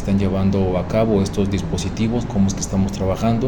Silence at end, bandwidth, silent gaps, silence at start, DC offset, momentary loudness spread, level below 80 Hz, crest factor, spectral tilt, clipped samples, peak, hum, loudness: 0 s; 17.5 kHz; none; 0 s; under 0.1%; 3 LU; -32 dBFS; 14 dB; -6.5 dB/octave; under 0.1%; -6 dBFS; none; -20 LUFS